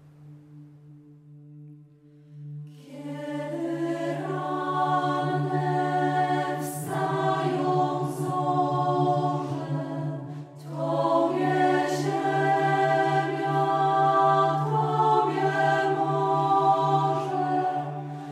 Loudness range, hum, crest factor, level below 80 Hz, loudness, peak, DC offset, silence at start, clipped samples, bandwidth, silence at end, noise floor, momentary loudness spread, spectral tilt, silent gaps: 10 LU; none; 16 dB; -72 dBFS; -25 LUFS; -10 dBFS; under 0.1%; 0.2 s; under 0.1%; 15.5 kHz; 0 s; -53 dBFS; 12 LU; -6.5 dB/octave; none